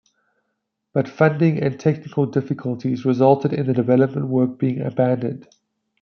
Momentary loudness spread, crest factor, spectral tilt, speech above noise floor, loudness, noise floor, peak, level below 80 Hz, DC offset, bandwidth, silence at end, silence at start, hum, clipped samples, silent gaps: 8 LU; 18 dB; -9.5 dB/octave; 57 dB; -20 LUFS; -76 dBFS; -2 dBFS; -64 dBFS; under 0.1%; 6.6 kHz; 0.6 s; 0.95 s; none; under 0.1%; none